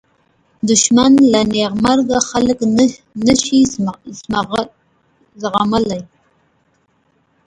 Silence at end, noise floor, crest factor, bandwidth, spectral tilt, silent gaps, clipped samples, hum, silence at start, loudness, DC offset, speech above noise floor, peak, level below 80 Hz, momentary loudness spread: 1.4 s; -60 dBFS; 16 dB; 11 kHz; -4 dB/octave; none; under 0.1%; none; 0.65 s; -14 LUFS; under 0.1%; 46 dB; 0 dBFS; -46 dBFS; 13 LU